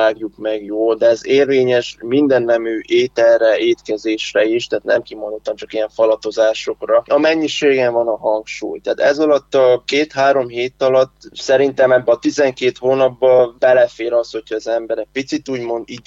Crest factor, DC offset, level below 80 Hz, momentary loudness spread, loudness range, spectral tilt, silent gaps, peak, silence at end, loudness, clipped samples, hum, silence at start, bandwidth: 12 dB; under 0.1%; -56 dBFS; 10 LU; 3 LU; -4.5 dB/octave; none; -2 dBFS; 0.05 s; -16 LUFS; under 0.1%; none; 0 s; 7.8 kHz